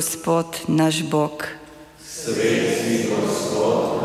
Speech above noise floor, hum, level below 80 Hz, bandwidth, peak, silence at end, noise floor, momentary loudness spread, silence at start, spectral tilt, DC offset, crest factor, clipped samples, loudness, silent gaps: 21 dB; none; -56 dBFS; 16 kHz; -8 dBFS; 0 s; -42 dBFS; 12 LU; 0 s; -4.5 dB/octave; under 0.1%; 14 dB; under 0.1%; -21 LUFS; none